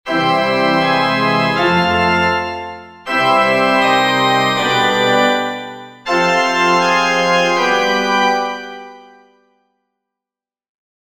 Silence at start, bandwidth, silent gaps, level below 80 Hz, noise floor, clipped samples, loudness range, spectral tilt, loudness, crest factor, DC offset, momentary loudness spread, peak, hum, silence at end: 0.05 s; 16.5 kHz; none; -52 dBFS; -88 dBFS; under 0.1%; 4 LU; -4 dB/octave; -14 LUFS; 14 dB; 0.3%; 12 LU; 0 dBFS; none; 2.15 s